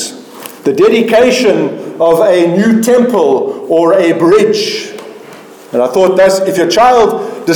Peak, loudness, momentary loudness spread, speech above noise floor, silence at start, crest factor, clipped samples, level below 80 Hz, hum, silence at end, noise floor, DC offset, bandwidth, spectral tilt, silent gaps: 0 dBFS; -9 LUFS; 11 LU; 24 dB; 0 s; 10 dB; under 0.1%; -48 dBFS; none; 0 s; -33 dBFS; under 0.1%; 19 kHz; -4.5 dB/octave; none